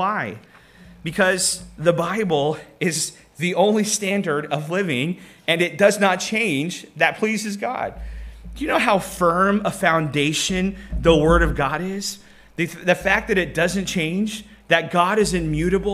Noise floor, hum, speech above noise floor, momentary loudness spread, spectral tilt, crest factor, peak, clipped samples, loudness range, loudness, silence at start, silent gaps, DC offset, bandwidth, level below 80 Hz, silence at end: -46 dBFS; none; 26 dB; 11 LU; -4 dB/octave; 20 dB; -2 dBFS; under 0.1%; 3 LU; -20 LUFS; 0 s; none; under 0.1%; 15.5 kHz; -36 dBFS; 0 s